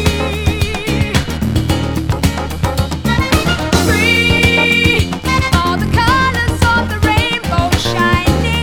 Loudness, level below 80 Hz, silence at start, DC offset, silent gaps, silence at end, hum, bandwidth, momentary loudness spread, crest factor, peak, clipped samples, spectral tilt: -13 LUFS; -24 dBFS; 0 s; under 0.1%; none; 0 s; none; 19.5 kHz; 7 LU; 14 dB; 0 dBFS; under 0.1%; -5 dB/octave